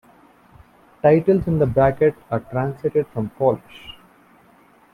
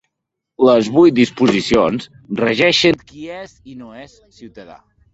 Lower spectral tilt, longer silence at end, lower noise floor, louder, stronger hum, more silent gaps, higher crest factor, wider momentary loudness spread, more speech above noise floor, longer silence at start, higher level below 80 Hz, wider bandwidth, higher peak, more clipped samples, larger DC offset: first, -9.5 dB/octave vs -5 dB/octave; first, 1 s vs 0.4 s; second, -53 dBFS vs -79 dBFS; second, -20 LUFS vs -14 LUFS; neither; neither; about the same, 18 dB vs 16 dB; second, 13 LU vs 22 LU; second, 34 dB vs 63 dB; first, 1.05 s vs 0.6 s; about the same, -48 dBFS vs -50 dBFS; first, 11.5 kHz vs 8.2 kHz; second, -4 dBFS vs 0 dBFS; neither; neither